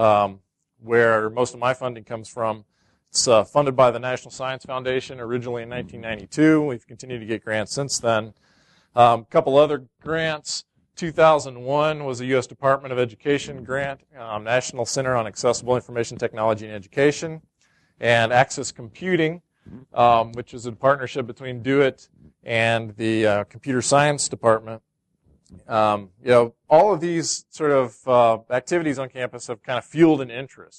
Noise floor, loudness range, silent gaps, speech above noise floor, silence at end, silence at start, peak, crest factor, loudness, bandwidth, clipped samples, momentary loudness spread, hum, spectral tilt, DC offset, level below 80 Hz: -62 dBFS; 4 LU; none; 41 dB; 0.15 s; 0 s; -2 dBFS; 20 dB; -21 LUFS; 11.5 kHz; under 0.1%; 13 LU; none; -4.5 dB/octave; under 0.1%; -58 dBFS